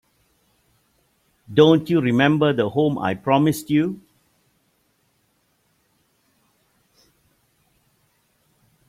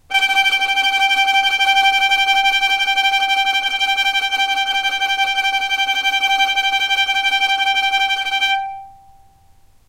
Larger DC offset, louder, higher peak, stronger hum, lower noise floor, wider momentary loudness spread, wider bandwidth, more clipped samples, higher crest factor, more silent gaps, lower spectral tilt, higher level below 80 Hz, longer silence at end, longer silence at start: neither; second, -19 LUFS vs -15 LUFS; about the same, -2 dBFS vs -4 dBFS; neither; first, -66 dBFS vs -49 dBFS; first, 8 LU vs 4 LU; about the same, 16 kHz vs 16 kHz; neither; first, 22 dB vs 14 dB; neither; first, -6.5 dB/octave vs 2.5 dB/octave; second, -62 dBFS vs -54 dBFS; first, 4.9 s vs 0.95 s; first, 1.5 s vs 0.1 s